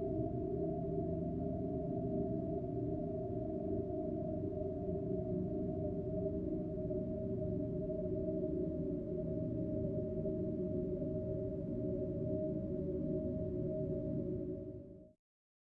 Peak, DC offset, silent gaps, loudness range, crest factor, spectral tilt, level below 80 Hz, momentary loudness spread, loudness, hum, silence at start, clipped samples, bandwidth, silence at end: -26 dBFS; under 0.1%; none; 1 LU; 12 dB; -13 dB/octave; -54 dBFS; 2 LU; -40 LUFS; none; 0 s; under 0.1%; 3.1 kHz; 0.6 s